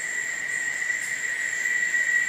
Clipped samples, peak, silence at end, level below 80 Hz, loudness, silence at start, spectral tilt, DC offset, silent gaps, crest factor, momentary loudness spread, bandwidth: under 0.1%; -12 dBFS; 0 s; -76 dBFS; -25 LUFS; 0 s; 1 dB/octave; under 0.1%; none; 14 dB; 5 LU; 15.5 kHz